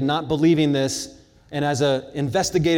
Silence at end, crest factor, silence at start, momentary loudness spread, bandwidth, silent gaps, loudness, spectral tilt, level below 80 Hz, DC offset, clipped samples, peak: 0 s; 14 dB; 0 s; 11 LU; 17 kHz; none; -21 LUFS; -5 dB/octave; -50 dBFS; under 0.1%; under 0.1%; -8 dBFS